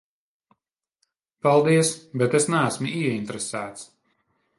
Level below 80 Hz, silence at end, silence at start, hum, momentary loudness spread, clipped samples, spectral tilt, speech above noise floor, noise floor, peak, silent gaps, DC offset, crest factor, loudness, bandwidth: -68 dBFS; 0.75 s; 1.45 s; none; 12 LU; under 0.1%; -5 dB/octave; 59 dB; -81 dBFS; -6 dBFS; none; under 0.1%; 20 dB; -23 LUFS; 11.5 kHz